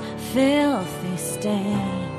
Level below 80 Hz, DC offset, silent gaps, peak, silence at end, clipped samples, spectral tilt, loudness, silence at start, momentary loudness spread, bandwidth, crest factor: -50 dBFS; under 0.1%; none; -8 dBFS; 0 s; under 0.1%; -5 dB/octave; -23 LUFS; 0 s; 8 LU; 15 kHz; 16 dB